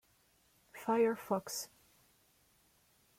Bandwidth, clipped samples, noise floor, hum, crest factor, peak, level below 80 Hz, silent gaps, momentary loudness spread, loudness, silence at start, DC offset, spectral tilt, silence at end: 16.5 kHz; under 0.1%; -72 dBFS; none; 18 dB; -22 dBFS; -80 dBFS; none; 17 LU; -36 LUFS; 0.75 s; under 0.1%; -4 dB/octave; 1.5 s